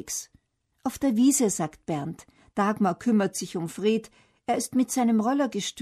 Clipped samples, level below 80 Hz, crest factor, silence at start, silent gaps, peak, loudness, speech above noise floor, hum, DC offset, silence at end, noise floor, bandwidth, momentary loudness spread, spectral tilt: under 0.1%; -62 dBFS; 14 dB; 0.05 s; none; -12 dBFS; -26 LUFS; 40 dB; none; under 0.1%; 0 s; -65 dBFS; 13.5 kHz; 13 LU; -4.5 dB/octave